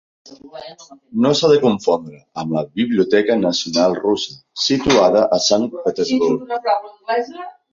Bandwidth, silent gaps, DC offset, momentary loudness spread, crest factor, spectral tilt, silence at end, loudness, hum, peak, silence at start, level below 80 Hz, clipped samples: 7.6 kHz; none; under 0.1%; 16 LU; 16 dB; -4.5 dB/octave; 0.2 s; -17 LUFS; none; 0 dBFS; 0.3 s; -52 dBFS; under 0.1%